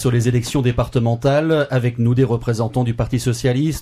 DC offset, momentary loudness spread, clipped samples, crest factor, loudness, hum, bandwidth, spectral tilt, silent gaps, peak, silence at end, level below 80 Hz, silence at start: under 0.1%; 3 LU; under 0.1%; 12 dB; -18 LUFS; none; 14.5 kHz; -6.5 dB/octave; none; -4 dBFS; 0 s; -36 dBFS; 0 s